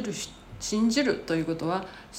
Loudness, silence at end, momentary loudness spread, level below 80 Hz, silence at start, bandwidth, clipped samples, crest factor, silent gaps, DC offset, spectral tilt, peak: -28 LUFS; 0 s; 12 LU; -54 dBFS; 0 s; 15.5 kHz; under 0.1%; 16 dB; none; under 0.1%; -4.5 dB/octave; -14 dBFS